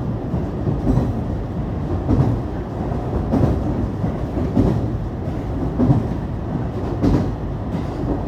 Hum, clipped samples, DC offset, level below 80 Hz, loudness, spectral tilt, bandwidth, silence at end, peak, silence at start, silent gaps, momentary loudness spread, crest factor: none; under 0.1%; under 0.1%; -28 dBFS; -22 LUFS; -9.5 dB/octave; 8.6 kHz; 0 s; -2 dBFS; 0 s; none; 7 LU; 18 dB